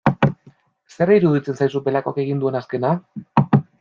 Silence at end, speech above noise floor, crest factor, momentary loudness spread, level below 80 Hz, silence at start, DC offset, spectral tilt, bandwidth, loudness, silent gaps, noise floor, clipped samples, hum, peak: 0.2 s; 33 dB; 18 dB; 7 LU; -56 dBFS; 0.05 s; under 0.1%; -9 dB/octave; 7.2 kHz; -20 LUFS; none; -52 dBFS; under 0.1%; none; -2 dBFS